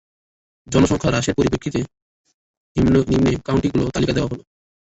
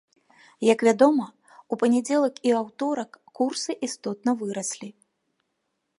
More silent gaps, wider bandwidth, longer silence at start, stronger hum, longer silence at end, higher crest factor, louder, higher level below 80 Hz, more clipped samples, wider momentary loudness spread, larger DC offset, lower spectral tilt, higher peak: first, 2.02-2.24 s, 2.34-2.75 s vs none; second, 8.2 kHz vs 11.5 kHz; about the same, 0.7 s vs 0.6 s; neither; second, 0.55 s vs 1.1 s; about the same, 18 dB vs 20 dB; first, -19 LUFS vs -24 LUFS; first, -38 dBFS vs -78 dBFS; neither; second, 10 LU vs 13 LU; neither; first, -6 dB/octave vs -4 dB/octave; about the same, -4 dBFS vs -4 dBFS